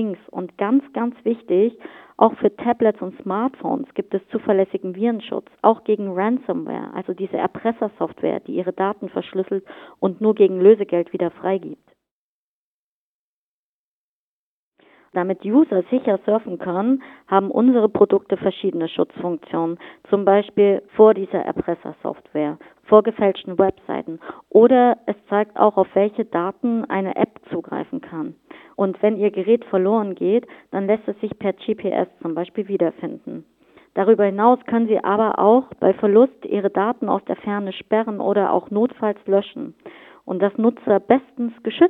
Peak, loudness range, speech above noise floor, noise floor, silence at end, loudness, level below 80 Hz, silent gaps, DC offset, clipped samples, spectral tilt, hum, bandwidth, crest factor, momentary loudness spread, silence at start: 0 dBFS; 6 LU; over 71 dB; under -90 dBFS; 0 s; -20 LUFS; -64 dBFS; 12.11-14.72 s; under 0.1%; under 0.1%; -10 dB/octave; none; 4 kHz; 20 dB; 13 LU; 0 s